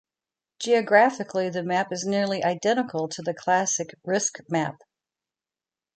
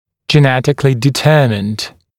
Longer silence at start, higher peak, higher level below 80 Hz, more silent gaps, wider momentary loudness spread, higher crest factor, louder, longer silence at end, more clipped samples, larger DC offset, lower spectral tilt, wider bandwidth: first, 0.6 s vs 0.3 s; second, -6 dBFS vs 0 dBFS; second, -74 dBFS vs -48 dBFS; neither; about the same, 10 LU vs 8 LU; first, 20 dB vs 12 dB; second, -24 LUFS vs -12 LUFS; first, 1.25 s vs 0.3 s; neither; neither; second, -3.5 dB/octave vs -6 dB/octave; second, 10 kHz vs 15.5 kHz